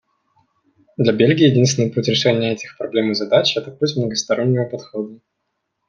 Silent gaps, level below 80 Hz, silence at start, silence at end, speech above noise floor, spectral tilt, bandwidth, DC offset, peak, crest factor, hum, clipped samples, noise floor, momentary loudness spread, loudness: none; -60 dBFS; 1 s; 0.75 s; 57 dB; -5 dB/octave; 7.6 kHz; under 0.1%; -2 dBFS; 16 dB; none; under 0.1%; -74 dBFS; 13 LU; -18 LUFS